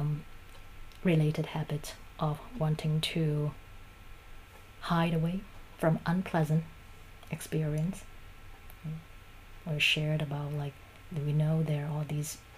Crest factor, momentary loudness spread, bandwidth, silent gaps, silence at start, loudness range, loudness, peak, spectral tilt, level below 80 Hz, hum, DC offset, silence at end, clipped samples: 18 dB; 24 LU; 15.5 kHz; none; 0 s; 3 LU; -32 LUFS; -14 dBFS; -6 dB/octave; -52 dBFS; none; under 0.1%; 0 s; under 0.1%